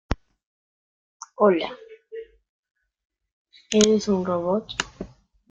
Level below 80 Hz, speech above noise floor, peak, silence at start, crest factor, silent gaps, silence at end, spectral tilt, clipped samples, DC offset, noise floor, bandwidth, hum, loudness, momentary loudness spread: -46 dBFS; 19 dB; -2 dBFS; 0.1 s; 26 dB; 0.46-1.20 s, 2.49-2.63 s, 2.71-2.75 s, 3.05-3.10 s, 3.33-3.45 s; 0.45 s; -4.5 dB/octave; under 0.1%; under 0.1%; -41 dBFS; 9.6 kHz; none; -23 LUFS; 22 LU